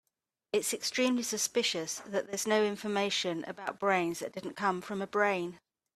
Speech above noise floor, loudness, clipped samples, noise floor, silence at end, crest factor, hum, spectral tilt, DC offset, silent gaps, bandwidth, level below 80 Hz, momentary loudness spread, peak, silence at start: 52 dB; -32 LUFS; under 0.1%; -84 dBFS; 0.4 s; 20 dB; none; -2.5 dB/octave; under 0.1%; none; 15.5 kHz; -76 dBFS; 7 LU; -14 dBFS; 0.55 s